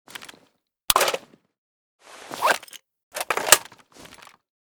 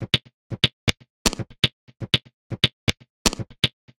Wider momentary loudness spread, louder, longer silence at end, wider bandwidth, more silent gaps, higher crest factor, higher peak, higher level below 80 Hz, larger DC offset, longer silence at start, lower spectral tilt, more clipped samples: first, 23 LU vs 5 LU; first, -21 LUFS vs -24 LUFS; first, 1 s vs 0.3 s; first, over 20 kHz vs 16.5 kHz; second, 1.58-1.99 s, 3.03-3.11 s vs 0.34-0.50 s, 0.73-0.87 s, 1.10-1.25 s, 1.73-1.87 s, 2.34-2.50 s, 2.73-2.87 s, 3.10-3.25 s; about the same, 26 dB vs 24 dB; about the same, 0 dBFS vs -2 dBFS; second, -60 dBFS vs -42 dBFS; neither; first, 0.2 s vs 0 s; second, 0.5 dB/octave vs -3 dB/octave; neither